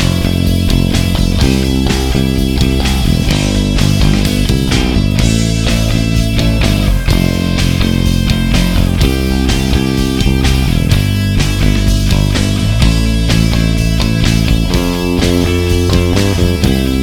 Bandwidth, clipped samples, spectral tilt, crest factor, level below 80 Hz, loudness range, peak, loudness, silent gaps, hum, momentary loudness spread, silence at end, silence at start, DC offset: 18 kHz; under 0.1%; -5.5 dB/octave; 10 dB; -16 dBFS; 0 LU; 0 dBFS; -12 LUFS; none; none; 2 LU; 0 s; 0 s; under 0.1%